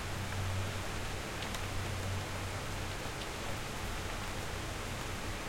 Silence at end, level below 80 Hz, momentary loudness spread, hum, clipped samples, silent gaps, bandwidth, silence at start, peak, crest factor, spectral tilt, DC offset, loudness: 0 s; -46 dBFS; 2 LU; none; under 0.1%; none; 16.5 kHz; 0 s; -24 dBFS; 14 dB; -4 dB/octave; under 0.1%; -39 LUFS